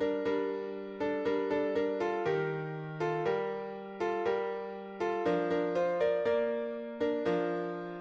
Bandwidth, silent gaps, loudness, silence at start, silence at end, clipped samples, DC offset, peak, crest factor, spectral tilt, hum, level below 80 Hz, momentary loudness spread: 7.2 kHz; none; -33 LUFS; 0 s; 0 s; under 0.1%; under 0.1%; -18 dBFS; 14 dB; -7 dB/octave; none; -70 dBFS; 8 LU